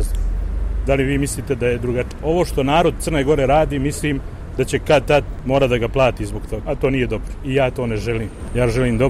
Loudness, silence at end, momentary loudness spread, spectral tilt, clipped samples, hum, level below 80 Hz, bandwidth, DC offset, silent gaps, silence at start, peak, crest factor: -19 LUFS; 0 s; 9 LU; -6 dB/octave; under 0.1%; none; -26 dBFS; 15 kHz; under 0.1%; none; 0 s; -4 dBFS; 14 dB